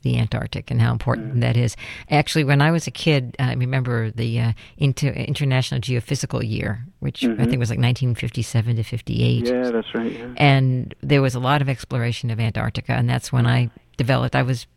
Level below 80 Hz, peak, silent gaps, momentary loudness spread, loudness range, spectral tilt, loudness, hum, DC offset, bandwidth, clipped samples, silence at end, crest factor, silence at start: -44 dBFS; -4 dBFS; none; 7 LU; 2 LU; -6.5 dB/octave; -21 LUFS; none; under 0.1%; 12.5 kHz; under 0.1%; 0.1 s; 18 dB; 0.05 s